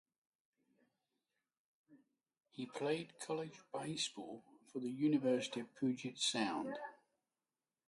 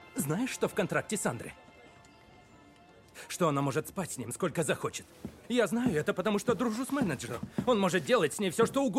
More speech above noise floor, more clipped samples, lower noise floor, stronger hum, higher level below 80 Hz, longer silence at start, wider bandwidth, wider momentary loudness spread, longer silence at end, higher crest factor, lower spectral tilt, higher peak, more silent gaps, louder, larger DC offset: first, over 50 dB vs 27 dB; neither; first, under -90 dBFS vs -57 dBFS; neither; second, -88 dBFS vs -62 dBFS; first, 1.9 s vs 0 s; second, 11.5 kHz vs 16.5 kHz; first, 15 LU vs 10 LU; first, 0.9 s vs 0 s; about the same, 20 dB vs 18 dB; about the same, -4 dB/octave vs -5 dB/octave; second, -22 dBFS vs -12 dBFS; neither; second, -41 LUFS vs -31 LUFS; neither